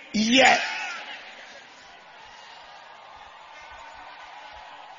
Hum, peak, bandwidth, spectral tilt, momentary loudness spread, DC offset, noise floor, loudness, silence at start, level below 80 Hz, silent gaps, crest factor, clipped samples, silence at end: none; -2 dBFS; 7.6 kHz; -2.5 dB/octave; 28 LU; under 0.1%; -48 dBFS; -20 LUFS; 0 s; -64 dBFS; none; 26 dB; under 0.1%; 0.05 s